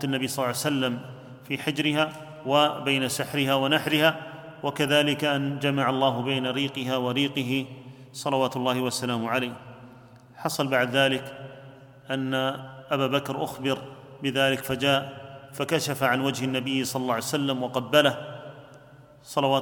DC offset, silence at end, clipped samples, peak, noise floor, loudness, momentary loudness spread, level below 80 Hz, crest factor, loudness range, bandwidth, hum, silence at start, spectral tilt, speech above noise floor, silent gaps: under 0.1%; 0 s; under 0.1%; -4 dBFS; -50 dBFS; -26 LUFS; 16 LU; -66 dBFS; 22 dB; 4 LU; 19 kHz; none; 0 s; -4.5 dB/octave; 25 dB; none